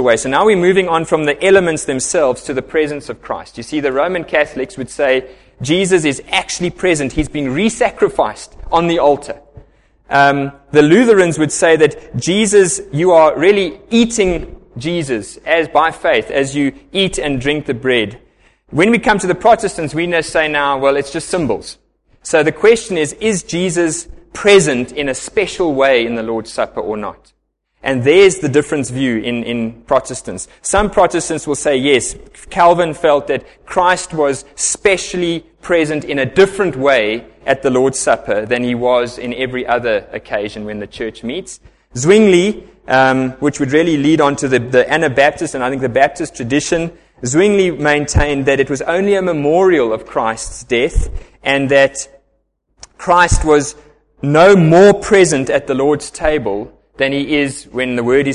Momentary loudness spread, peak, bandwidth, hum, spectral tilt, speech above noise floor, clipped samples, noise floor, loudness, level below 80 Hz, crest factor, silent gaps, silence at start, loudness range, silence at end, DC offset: 12 LU; 0 dBFS; 11.5 kHz; none; -4.5 dB/octave; 49 dB; under 0.1%; -63 dBFS; -14 LUFS; -34 dBFS; 14 dB; none; 0 s; 5 LU; 0 s; under 0.1%